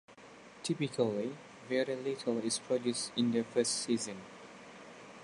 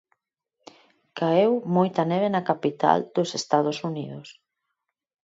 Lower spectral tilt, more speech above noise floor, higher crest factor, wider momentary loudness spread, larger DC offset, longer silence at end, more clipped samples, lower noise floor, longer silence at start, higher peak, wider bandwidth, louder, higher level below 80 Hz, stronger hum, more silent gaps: second, -4 dB/octave vs -6 dB/octave; second, 21 dB vs 58 dB; about the same, 18 dB vs 22 dB; first, 19 LU vs 12 LU; neither; second, 0 s vs 0.9 s; neither; second, -55 dBFS vs -82 dBFS; second, 0.1 s vs 1.15 s; second, -16 dBFS vs -4 dBFS; first, 11.5 kHz vs 8 kHz; second, -34 LUFS vs -24 LUFS; about the same, -78 dBFS vs -74 dBFS; neither; neither